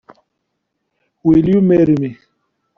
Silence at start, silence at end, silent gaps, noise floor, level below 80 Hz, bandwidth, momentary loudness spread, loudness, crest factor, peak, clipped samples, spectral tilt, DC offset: 1.25 s; 0.65 s; none; -73 dBFS; -46 dBFS; 5.8 kHz; 8 LU; -13 LUFS; 14 dB; -2 dBFS; under 0.1%; -10 dB/octave; under 0.1%